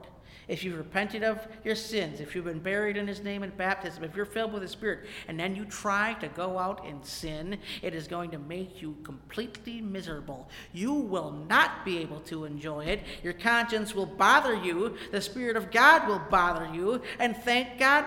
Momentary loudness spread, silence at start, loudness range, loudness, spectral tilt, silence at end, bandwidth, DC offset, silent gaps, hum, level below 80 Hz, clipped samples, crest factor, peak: 15 LU; 0 s; 12 LU; -29 LUFS; -4 dB/octave; 0 s; 17 kHz; under 0.1%; none; none; -54 dBFS; under 0.1%; 24 dB; -6 dBFS